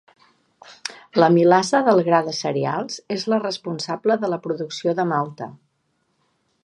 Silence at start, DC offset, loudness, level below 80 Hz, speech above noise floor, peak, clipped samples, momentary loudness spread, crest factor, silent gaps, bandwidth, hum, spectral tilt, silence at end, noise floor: 0.7 s; under 0.1%; -20 LUFS; -72 dBFS; 50 dB; 0 dBFS; under 0.1%; 15 LU; 20 dB; none; 11.5 kHz; none; -5.5 dB/octave; 1.1 s; -70 dBFS